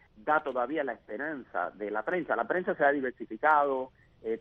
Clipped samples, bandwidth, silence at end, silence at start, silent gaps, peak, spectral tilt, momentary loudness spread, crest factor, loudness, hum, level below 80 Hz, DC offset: under 0.1%; 4.5 kHz; 0 s; 0.15 s; none; -12 dBFS; -7.5 dB/octave; 11 LU; 20 dB; -30 LUFS; none; -68 dBFS; under 0.1%